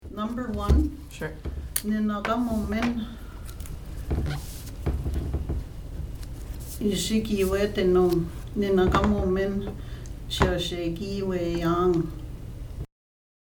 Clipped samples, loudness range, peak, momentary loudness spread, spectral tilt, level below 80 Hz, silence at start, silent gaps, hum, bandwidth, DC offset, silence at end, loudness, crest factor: under 0.1%; 8 LU; -2 dBFS; 16 LU; -6 dB/octave; -34 dBFS; 0 s; none; none; over 20 kHz; under 0.1%; 0.55 s; -27 LUFS; 24 dB